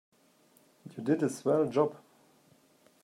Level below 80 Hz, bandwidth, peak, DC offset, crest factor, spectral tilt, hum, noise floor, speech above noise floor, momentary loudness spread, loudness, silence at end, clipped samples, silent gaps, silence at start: -80 dBFS; 14 kHz; -14 dBFS; under 0.1%; 20 dB; -7 dB/octave; none; -65 dBFS; 36 dB; 10 LU; -30 LUFS; 1.05 s; under 0.1%; none; 0.85 s